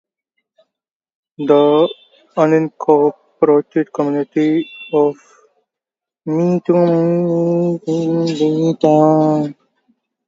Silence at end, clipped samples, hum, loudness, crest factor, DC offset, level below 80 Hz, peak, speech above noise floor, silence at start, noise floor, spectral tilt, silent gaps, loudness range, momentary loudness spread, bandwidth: 0.75 s; under 0.1%; none; -15 LUFS; 16 dB; under 0.1%; -66 dBFS; 0 dBFS; 73 dB; 1.4 s; -87 dBFS; -8 dB/octave; none; 3 LU; 8 LU; 7.6 kHz